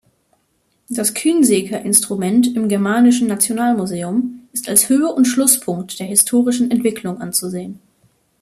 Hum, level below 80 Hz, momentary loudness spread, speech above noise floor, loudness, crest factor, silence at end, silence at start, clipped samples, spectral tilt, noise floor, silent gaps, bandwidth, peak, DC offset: none; -60 dBFS; 11 LU; 48 dB; -16 LUFS; 16 dB; 0.65 s; 0.9 s; under 0.1%; -3.5 dB/octave; -64 dBFS; none; 15 kHz; 0 dBFS; under 0.1%